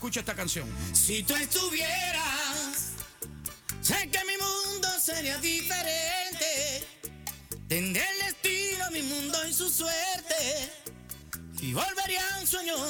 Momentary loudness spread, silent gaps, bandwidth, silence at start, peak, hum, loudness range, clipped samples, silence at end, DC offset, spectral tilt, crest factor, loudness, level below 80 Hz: 12 LU; none; over 20 kHz; 0 s; -8 dBFS; none; 2 LU; under 0.1%; 0 s; under 0.1%; -1.5 dB/octave; 24 dB; -28 LUFS; -52 dBFS